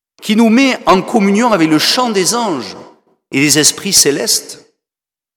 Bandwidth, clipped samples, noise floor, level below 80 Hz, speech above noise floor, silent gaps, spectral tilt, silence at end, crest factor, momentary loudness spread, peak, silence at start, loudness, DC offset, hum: 19.5 kHz; under 0.1%; -89 dBFS; -50 dBFS; 77 dB; none; -3 dB/octave; 0.8 s; 14 dB; 10 LU; 0 dBFS; 0.2 s; -11 LUFS; under 0.1%; none